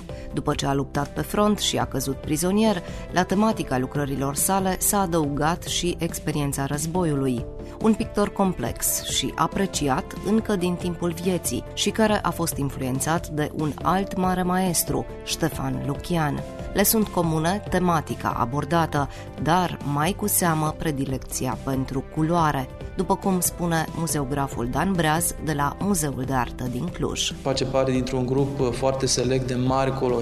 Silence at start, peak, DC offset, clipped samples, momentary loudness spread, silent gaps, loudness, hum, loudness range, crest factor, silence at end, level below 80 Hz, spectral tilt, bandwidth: 0 s; -4 dBFS; under 0.1%; under 0.1%; 7 LU; none; -24 LUFS; none; 2 LU; 18 dB; 0 s; -40 dBFS; -4.5 dB/octave; 14 kHz